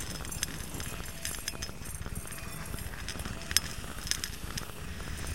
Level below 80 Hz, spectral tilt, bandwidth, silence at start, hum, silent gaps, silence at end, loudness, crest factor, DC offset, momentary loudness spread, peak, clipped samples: -44 dBFS; -2 dB/octave; 16.5 kHz; 0 s; none; none; 0 s; -36 LUFS; 36 dB; 0.6%; 11 LU; -2 dBFS; under 0.1%